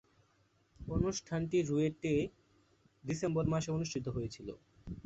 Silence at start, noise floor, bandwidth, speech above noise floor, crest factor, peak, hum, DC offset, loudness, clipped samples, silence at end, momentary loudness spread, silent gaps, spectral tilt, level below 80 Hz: 0.8 s; -72 dBFS; 8 kHz; 37 dB; 20 dB; -18 dBFS; none; under 0.1%; -36 LUFS; under 0.1%; 0.05 s; 16 LU; none; -7 dB/octave; -54 dBFS